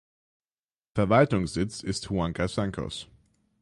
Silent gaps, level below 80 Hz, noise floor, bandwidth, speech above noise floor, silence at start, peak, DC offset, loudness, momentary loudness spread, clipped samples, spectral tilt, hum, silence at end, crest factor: none; -48 dBFS; under -90 dBFS; 11.5 kHz; over 64 dB; 0.95 s; -6 dBFS; under 0.1%; -27 LUFS; 13 LU; under 0.1%; -6 dB/octave; none; 0.6 s; 22 dB